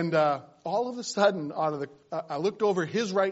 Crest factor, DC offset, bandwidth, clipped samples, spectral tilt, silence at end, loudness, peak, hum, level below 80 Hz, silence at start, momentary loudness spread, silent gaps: 18 dB; under 0.1%; 8 kHz; under 0.1%; -4.5 dB/octave; 0 s; -28 LUFS; -10 dBFS; none; -76 dBFS; 0 s; 9 LU; none